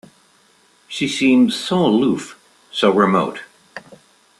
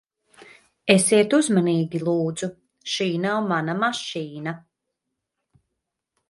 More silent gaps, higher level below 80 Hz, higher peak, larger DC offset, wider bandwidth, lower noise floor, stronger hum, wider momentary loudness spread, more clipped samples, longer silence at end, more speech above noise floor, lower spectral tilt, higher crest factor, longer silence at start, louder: neither; first, -60 dBFS vs -68 dBFS; about the same, -2 dBFS vs -2 dBFS; neither; about the same, 12.5 kHz vs 11.5 kHz; second, -55 dBFS vs -81 dBFS; neither; first, 23 LU vs 15 LU; neither; second, 0.45 s vs 1.7 s; second, 39 dB vs 60 dB; about the same, -5.5 dB/octave vs -4.5 dB/octave; second, 18 dB vs 24 dB; about the same, 0.9 s vs 0.85 s; first, -17 LUFS vs -22 LUFS